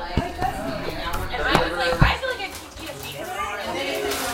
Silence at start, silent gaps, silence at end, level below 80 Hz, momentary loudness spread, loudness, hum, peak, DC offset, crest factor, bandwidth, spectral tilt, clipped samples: 0 s; none; 0 s; -34 dBFS; 12 LU; -25 LUFS; none; 0 dBFS; under 0.1%; 24 dB; 17 kHz; -4.5 dB/octave; under 0.1%